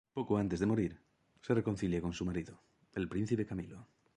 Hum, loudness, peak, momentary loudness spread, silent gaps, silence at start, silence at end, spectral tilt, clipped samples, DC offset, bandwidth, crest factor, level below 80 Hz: none; -36 LUFS; -18 dBFS; 15 LU; none; 0.15 s; 0.3 s; -7.5 dB/octave; under 0.1%; under 0.1%; 10.5 kHz; 18 dB; -56 dBFS